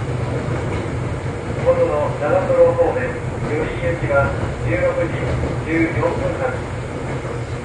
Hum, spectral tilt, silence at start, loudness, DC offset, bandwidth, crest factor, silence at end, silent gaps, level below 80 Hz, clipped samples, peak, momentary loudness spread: none; -7.5 dB/octave; 0 s; -20 LUFS; under 0.1%; 10.5 kHz; 16 dB; 0 s; none; -32 dBFS; under 0.1%; -2 dBFS; 9 LU